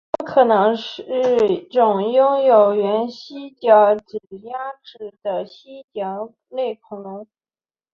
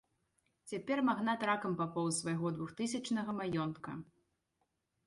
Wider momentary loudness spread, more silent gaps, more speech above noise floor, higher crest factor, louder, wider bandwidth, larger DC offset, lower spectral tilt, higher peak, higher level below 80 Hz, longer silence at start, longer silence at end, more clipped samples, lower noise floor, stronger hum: first, 20 LU vs 11 LU; first, 5.84-5.88 s vs none; first, over 71 dB vs 47 dB; about the same, 18 dB vs 18 dB; first, -18 LUFS vs -37 LUFS; second, 6.8 kHz vs 11.5 kHz; neither; first, -6.5 dB/octave vs -5 dB/octave; first, -2 dBFS vs -20 dBFS; first, -66 dBFS vs -74 dBFS; second, 0.2 s vs 0.65 s; second, 0.7 s vs 1.05 s; neither; first, under -90 dBFS vs -83 dBFS; neither